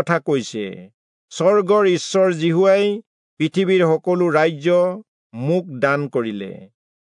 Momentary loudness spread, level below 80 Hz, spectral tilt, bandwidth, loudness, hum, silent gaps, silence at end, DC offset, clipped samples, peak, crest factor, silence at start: 15 LU; -74 dBFS; -6 dB/octave; 10.5 kHz; -18 LUFS; none; 0.94-1.28 s, 3.06-3.37 s, 5.08-5.30 s; 0.4 s; under 0.1%; under 0.1%; -4 dBFS; 14 dB; 0 s